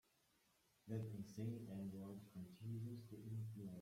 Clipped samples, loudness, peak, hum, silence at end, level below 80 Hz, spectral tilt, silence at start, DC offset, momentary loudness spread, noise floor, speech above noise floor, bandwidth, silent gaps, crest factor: under 0.1%; -52 LUFS; -36 dBFS; none; 0 s; -80 dBFS; -8 dB/octave; 0.85 s; under 0.1%; 6 LU; -80 dBFS; 29 dB; 16 kHz; none; 16 dB